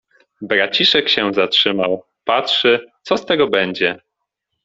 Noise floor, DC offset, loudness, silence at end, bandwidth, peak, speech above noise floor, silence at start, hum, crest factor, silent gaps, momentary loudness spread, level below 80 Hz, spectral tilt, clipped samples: -76 dBFS; under 0.1%; -16 LUFS; 0.7 s; 7.8 kHz; 0 dBFS; 60 dB; 0.4 s; none; 18 dB; none; 9 LU; -60 dBFS; -4 dB/octave; under 0.1%